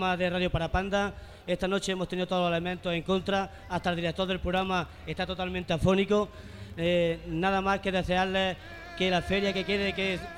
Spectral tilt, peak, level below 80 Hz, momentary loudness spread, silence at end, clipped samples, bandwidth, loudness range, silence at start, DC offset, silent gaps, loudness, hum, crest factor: -5.5 dB/octave; -12 dBFS; -46 dBFS; 8 LU; 0 s; under 0.1%; 14.5 kHz; 2 LU; 0 s; under 0.1%; none; -29 LUFS; none; 18 dB